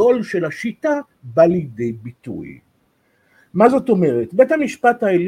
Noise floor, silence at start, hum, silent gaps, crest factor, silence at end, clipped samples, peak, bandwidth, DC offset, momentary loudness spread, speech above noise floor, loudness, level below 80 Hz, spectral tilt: -62 dBFS; 0 s; none; none; 16 dB; 0 s; under 0.1%; 0 dBFS; 12 kHz; under 0.1%; 17 LU; 45 dB; -17 LUFS; -58 dBFS; -7.5 dB/octave